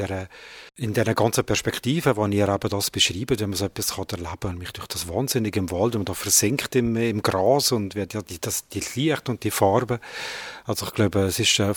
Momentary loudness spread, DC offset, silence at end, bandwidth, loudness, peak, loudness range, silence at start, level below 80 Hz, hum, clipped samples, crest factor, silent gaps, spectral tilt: 12 LU; under 0.1%; 0 s; over 20 kHz; -23 LUFS; -4 dBFS; 3 LU; 0 s; -50 dBFS; none; under 0.1%; 20 dB; none; -4 dB/octave